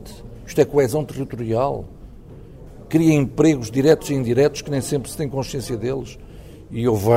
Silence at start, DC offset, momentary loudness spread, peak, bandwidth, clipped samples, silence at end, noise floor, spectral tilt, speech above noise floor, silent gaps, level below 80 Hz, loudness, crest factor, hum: 0 s; under 0.1%; 15 LU; -2 dBFS; 16 kHz; under 0.1%; 0 s; -40 dBFS; -6.5 dB/octave; 21 dB; none; -42 dBFS; -20 LUFS; 18 dB; none